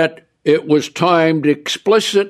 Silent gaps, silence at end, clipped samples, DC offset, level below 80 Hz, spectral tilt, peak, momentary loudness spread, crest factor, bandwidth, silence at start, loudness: none; 0 s; under 0.1%; under 0.1%; -66 dBFS; -5 dB/octave; -2 dBFS; 5 LU; 14 dB; 13.5 kHz; 0 s; -15 LUFS